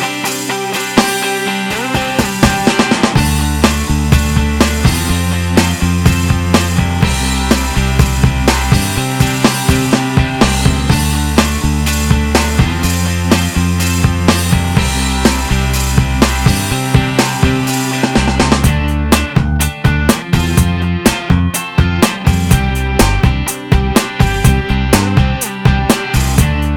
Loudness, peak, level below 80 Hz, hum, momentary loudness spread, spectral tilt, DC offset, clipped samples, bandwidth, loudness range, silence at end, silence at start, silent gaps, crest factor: -13 LUFS; 0 dBFS; -18 dBFS; none; 3 LU; -5 dB/octave; under 0.1%; 0.2%; 20 kHz; 1 LU; 0 s; 0 s; none; 12 dB